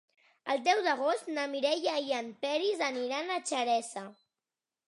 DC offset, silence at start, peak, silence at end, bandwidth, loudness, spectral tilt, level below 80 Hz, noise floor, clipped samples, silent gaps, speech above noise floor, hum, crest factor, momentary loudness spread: under 0.1%; 0.45 s; -14 dBFS; 0.75 s; 11.5 kHz; -31 LUFS; -1.5 dB/octave; under -90 dBFS; under -90 dBFS; under 0.1%; none; over 59 dB; none; 18 dB; 8 LU